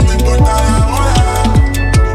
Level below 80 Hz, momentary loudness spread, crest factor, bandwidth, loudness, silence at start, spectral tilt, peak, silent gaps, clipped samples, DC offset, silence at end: -12 dBFS; 1 LU; 10 dB; 14 kHz; -12 LUFS; 0 s; -5.5 dB/octave; 0 dBFS; none; under 0.1%; under 0.1%; 0 s